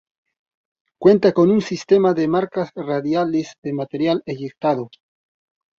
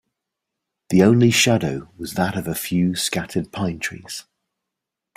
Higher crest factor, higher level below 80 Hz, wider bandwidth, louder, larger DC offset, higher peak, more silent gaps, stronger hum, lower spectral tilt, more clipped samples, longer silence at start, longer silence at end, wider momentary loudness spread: about the same, 18 dB vs 18 dB; second, -62 dBFS vs -54 dBFS; second, 7.4 kHz vs 16 kHz; about the same, -19 LUFS vs -20 LUFS; neither; about the same, -2 dBFS vs -2 dBFS; first, 3.58-3.62 s vs none; neither; first, -7 dB/octave vs -4.5 dB/octave; neither; about the same, 1 s vs 0.9 s; about the same, 0.9 s vs 0.95 s; second, 11 LU vs 16 LU